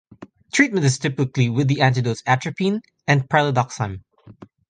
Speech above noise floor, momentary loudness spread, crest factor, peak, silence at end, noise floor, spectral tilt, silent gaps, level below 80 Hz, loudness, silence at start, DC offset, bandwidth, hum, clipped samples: 26 dB; 8 LU; 18 dB; -2 dBFS; 0.25 s; -45 dBFS; -5.5 dB/octave; none; -54 dBFS; -20 LUFS; 0.2 s; under 0.1%; 9.6 kHz; none; under 0.1%